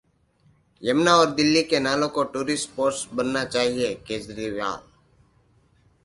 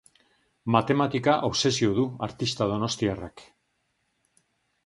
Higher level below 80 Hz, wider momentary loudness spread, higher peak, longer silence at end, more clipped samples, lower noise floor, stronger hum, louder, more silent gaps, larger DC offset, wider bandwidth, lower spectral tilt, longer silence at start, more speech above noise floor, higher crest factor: about the same, -58 dBFS vs -56 dBFS; first, 13 LU vs 8 LU; about the same, -4 dBFS vs -6 dBFS; second, 1.25 s vs 1.45 s; neither; second, -62 dBFS vs -74 dBFS; neither; about the same, -23 LUFS vs -25 LUFS; neither; neither; about the same, 11.5 kHz vs 11.5 kHz; second, -3.5 dB/octave vs -5 dB/octave; first, 0.8 s vs 0.65 s; second, 39 dB vs 49 dB; about the same, 22 dB vs 22 dB